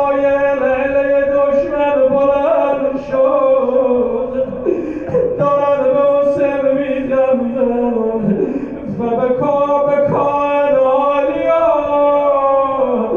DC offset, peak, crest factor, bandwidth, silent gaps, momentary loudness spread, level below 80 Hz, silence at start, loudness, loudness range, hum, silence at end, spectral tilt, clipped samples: under 0.1%; -4 dBFS; 10 dB; 6.6 kHz; none; 5 LU; -44 dBFS; 0 s; -14 LUFS; 2 LU; none; 0 s; -8.5 dB/octave; under 0.1%